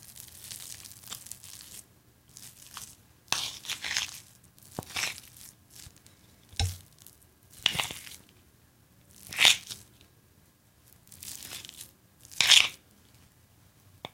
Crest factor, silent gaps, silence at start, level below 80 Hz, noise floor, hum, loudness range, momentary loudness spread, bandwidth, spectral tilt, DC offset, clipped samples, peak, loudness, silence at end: 32 dB; none; 0.1 s; -56 dBFS; -62 dBFS; none; 11 LU; 28 LU; 17 kHz; 0 dB/octave; under 0.1%; under 0.1%; -2 dBFS; -26 LUFS; 0.05 s